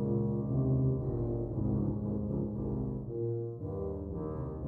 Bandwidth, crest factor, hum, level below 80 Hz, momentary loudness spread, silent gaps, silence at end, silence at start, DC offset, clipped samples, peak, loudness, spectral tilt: 1.8 kHz; 14 dB; none; -46 dBFS; 8 LU; none; 0 s; 0 s; under 0.1%; under 0.1%; -20 dBFS; -34 LUFS; -14 dB/octave